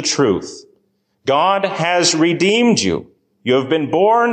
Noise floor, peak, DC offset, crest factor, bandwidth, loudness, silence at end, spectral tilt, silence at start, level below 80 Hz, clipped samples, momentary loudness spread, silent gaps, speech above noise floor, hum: -64 dBFS; -2 dBFS; under 0.1%; 14 dB; 9.8 kHz; -15 LUFS; 0 s; -3.5 dB/octave; 0 s; -52 dBFS; under 0.1%; 11 LU; none; 49 dB; none